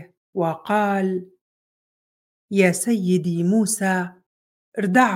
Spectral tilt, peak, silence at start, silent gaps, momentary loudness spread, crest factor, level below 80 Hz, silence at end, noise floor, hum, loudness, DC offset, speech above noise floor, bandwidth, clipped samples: -5.5 dB/octave; -2 dBFS; 0 s; 0.17-0.33 s, 1.41-2.48 s, 4.26-4.72 s; 11 LU; 20 dB; -72 dBFS; 0 s; under -90 dBFS; none; -21 LUFS; under 0.1%; over 70 dB; 16.5 kHz; under 0.1%